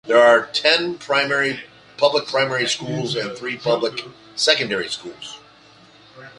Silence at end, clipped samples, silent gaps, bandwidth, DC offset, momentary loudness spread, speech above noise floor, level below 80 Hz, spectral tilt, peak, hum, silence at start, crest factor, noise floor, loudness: 0.1 s; under 0.1%; none; 11.5 kHz; under 0.1%; 17 LU; 29 dB; -64 dBFS; -3 dB/octave; 0 dBFS; none; 0.05 s; 20 dB; -49 dBFS; -19 LUFS